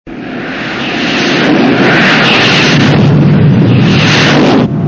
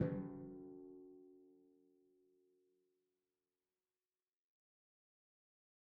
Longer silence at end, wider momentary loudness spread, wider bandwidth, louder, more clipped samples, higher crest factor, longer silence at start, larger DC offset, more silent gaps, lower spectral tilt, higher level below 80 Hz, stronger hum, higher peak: second, 0 s vs 4.15 s; second, 10 LU vs 20 LU; first, 8 kHz vs 2.6 kHz; first, -7 LUFS vs -50 LUFS; first, 1% vs under 0.1%; second, 8 dB vs 28 dB; about the same, 0.05 s vs 0 s; neither; neither; second, -5.5 dB/octave vs -8.5 dB/octave; first, -34 dBFS vs -78 dBFS; neither; first, 0 dBFS vs -24 dBFS